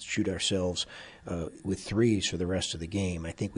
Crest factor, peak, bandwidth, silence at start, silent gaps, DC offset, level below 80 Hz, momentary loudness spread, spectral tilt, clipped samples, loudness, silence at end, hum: 16 dB; -14 dBFS; 11.5 kHz; 0 s; none; under 0.1%; -52 dBFS; 10 LU; -4.5 dB/octave; under 0.1%; -31 LUFS; 0 s; none